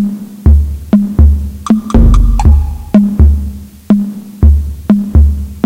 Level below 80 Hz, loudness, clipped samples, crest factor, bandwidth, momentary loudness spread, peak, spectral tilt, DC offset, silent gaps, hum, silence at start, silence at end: -10 dBFS; -11 LUFS; 2%; 8 dB; 8.8 kHz; 8 LU; 0 dBFS; -9 dB/octave; under 0.1%; none; none; 0 s; 0.05 s